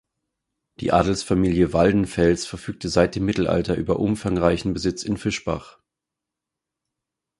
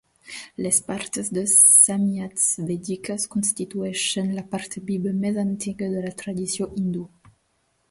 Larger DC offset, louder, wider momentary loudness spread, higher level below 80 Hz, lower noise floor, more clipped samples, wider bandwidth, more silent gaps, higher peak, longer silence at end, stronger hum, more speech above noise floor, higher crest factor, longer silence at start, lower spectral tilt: neither; about the same, -22 LUFS vs -21 LUFS; second, 8 LU vs 17 LU; first, -40 dBFS vs -60 dBFS; first, -85 dBFS vs -69 dBFS; neither; about the same, 11.5 kHz vs 12 kHz; neither; about the same, -2 dBFS vs -2 dBFS; first, 1.7 s vs 0.85 s; neither; first, 64 dB vs 46 dB; about the same, 22 dB vs 22 dB; first, 0.8 s vs 0.25 s; first, -6 dB/octave vs -3 dB/octave